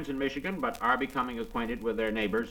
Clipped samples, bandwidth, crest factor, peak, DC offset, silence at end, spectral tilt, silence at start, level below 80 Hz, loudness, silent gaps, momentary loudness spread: under 0.1%; 19 kHz; 18 dB; -12 dBFS; under 0.1%; 0 s; -5.5 dB/octave; 0 s; -50 dBFS; -31 LUFS; none; 5 LU